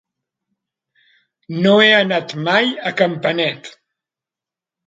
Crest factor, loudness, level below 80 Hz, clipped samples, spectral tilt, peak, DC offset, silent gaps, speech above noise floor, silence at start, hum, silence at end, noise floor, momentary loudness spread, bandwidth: 18 dB; -15 LUFS; -66 dBFS; under 0.1%; -5.5 dB/octave; 0 dBFS; under 0.1%; none; 73 dB; 1.5 s; none; 1.15 s; -88 dBFS; 11 LU; 7.8 kHz